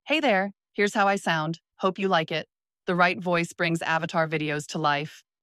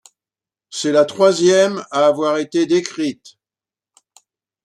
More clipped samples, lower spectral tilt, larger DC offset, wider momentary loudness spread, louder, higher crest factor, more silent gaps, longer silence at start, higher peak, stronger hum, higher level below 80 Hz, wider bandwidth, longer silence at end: neither; about the same, -5 dB/octave vs -4 dB/octave; neither; about the same, 9 LU vs 10 LU; second, -25 LUFS vs -16 LUFS; about the same, 18 dB vs 16 dB; neither; second, 0.05 s vs 0.7 s; second, -8 dBFS vs -2 dBFS; neither; about the same, -72 dBFS vs -68 dBFS; first, 14 kHz vs 11 kHz; second, 0.25 s vs 1.5 s